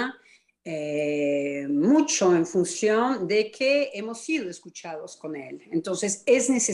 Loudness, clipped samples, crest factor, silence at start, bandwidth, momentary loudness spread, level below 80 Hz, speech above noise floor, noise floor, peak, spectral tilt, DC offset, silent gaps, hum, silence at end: -24 LUFS; under 0.1%; 16 dB; 0 s; 12 kHz; 16 LU; -72 dBFS; 34 dB; -59 dBFS; -8 dBFS; -3.5 dB/octave; under 0.1%; none; none; 0 s